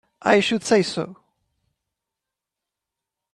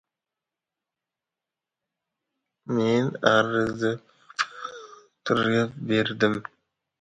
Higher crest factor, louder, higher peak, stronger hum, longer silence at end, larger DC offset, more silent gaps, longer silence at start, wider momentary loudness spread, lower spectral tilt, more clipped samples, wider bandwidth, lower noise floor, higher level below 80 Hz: about the same, 22 dB vs 24 dB; first, -20 LUFS vs -25 LUFS; about the same, -2 dBFS vs -4 dBFS; neither; first, 2.2 s vs 0.6 s; neither; neither; second, 0.25 s vs 2.65 s; second, 12 LU vs 17 LU; second, -4 dB/octave vs -5.5 dB/octave; neither; first, 11.5 kHz vs 9.2 kHz; about the same, -86 dBFS vs -88 dBFS; about the same, -66 dBFS vs -64 dBFS